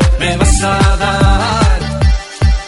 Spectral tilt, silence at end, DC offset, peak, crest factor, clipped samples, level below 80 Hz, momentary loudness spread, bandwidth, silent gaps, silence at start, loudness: -5 dB/octave; 0 s; under 0.1%; 0 dBFS; 10 dB; under 0.1%; -14 dBFS; 4 LU; 11.5 kHz; none; 0 s; -12 LUFS